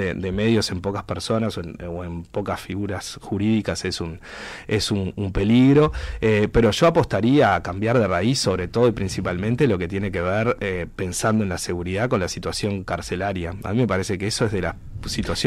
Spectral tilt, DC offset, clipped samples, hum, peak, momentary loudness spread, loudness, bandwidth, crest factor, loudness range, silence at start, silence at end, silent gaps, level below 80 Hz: -5.5 dB/octave; under 0.1%; under 0.1%; none; -8 dBFS; 12 LU; -22 LUFS; 15.5 kHz; 14 dB; 7 LU; 0 s; 0 s; none; -40 dBFS